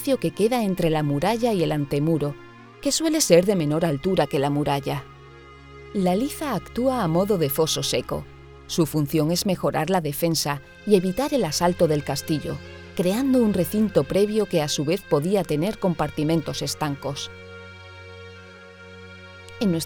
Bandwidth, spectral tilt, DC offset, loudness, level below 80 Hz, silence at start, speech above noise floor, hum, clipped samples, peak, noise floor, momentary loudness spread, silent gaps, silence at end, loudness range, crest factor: over 20 kHz; -5 dB/octave; under 0.1%; -23 LUFS; -48 dBFS; 0 s; 23 dB; none; under 0.1%; -2 dBFS; -45 dBFS; 20 LU; none; 0 s; 4 LU; 20 dB